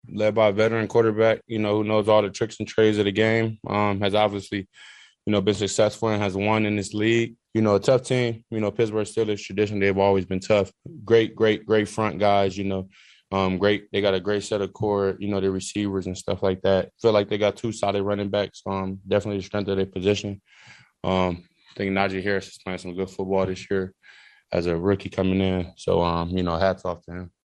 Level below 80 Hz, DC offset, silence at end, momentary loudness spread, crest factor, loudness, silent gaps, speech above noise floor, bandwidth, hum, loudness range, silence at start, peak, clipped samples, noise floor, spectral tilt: -54 dBFS; under 0.1%; 0.15 s; 9 LU; 20 dB; -24 LUFS; none; 29 dB; 11.5 kHz; none; 5 LU; 0.05 s; -4 dBFS; under 0.1%; -52 dBFS; -6 dB/octave